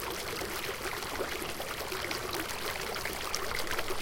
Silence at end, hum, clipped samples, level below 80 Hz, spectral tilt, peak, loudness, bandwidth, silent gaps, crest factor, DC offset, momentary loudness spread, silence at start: 0 s; none; under 0.1%; -50 dBFS; -2 dB/octave; -12 dBFS; -35 LUFS; 17 kHz; none; 24 dB; under 0.1%; 2 LU; 0 s